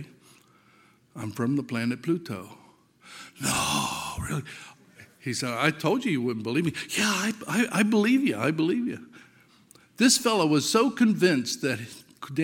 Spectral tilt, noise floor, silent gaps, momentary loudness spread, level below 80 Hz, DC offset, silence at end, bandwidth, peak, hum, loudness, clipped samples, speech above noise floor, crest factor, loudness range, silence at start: -4 dB/octave; -60 dBFS; none; 17 LU; -58 dBFS; under 0.1%; 0 s; 17 kHz; -6 dBFS; none; -25 LUFS; under 0.1%; 34 dB; 22 dB; 7 LU; 0 s